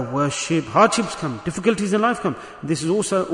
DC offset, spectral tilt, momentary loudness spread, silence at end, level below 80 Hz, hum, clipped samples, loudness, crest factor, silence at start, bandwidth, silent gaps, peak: under 0.1%; -4.5 dB/octave; 10 LU; 0 s; -54 dBFS; none; under 0.1%; -21 LUFS; 18 dB; 0 s; 11 kHz; none; -2 dBFS